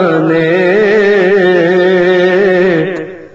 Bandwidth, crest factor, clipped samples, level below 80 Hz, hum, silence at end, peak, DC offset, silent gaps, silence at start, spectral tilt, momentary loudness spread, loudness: 7.6 kHz; 10 dB; under 0.1%; -50 dBFS; none; 0.05 s; 0 dBFS; under 0.1%; none; 0 s; -7 dB/octave; 3 LU; -9 LUFS